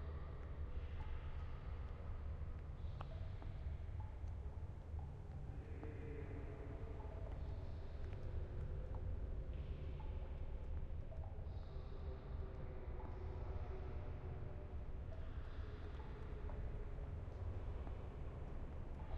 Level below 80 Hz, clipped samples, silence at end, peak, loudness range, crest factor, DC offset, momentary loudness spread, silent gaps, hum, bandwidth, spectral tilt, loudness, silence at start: -50 dBFS; under 0.1%; 0 s; -32 dBFS; 1 LU; 14 dB; under 0.1%; 3 LU; none; none; 5.8 kHz; -9 dB/octave; -51 LUFS; 0 s